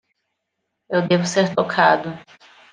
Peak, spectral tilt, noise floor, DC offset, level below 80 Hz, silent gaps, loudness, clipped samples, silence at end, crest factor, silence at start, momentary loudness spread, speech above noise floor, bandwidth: -2 dBFS; -5 dB/octave; -77 dBFS; under 0.1%; -68 dBFS; none; -18 LUFS; under 0.1%; 0.5 s; 20 dB; 0.9 s; 12 LU; 59 dB; 9.8 kHz